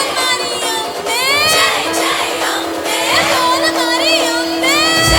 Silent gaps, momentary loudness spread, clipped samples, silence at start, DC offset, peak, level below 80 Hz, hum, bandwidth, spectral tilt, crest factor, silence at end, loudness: none; 7 LU; under 0.1%; 0 s; under 0.1%; 0 dBFS; -36 dBFS; none; 19.5 kHz; -2 dB/octave; 14 dB; 0 s; -13 LUFS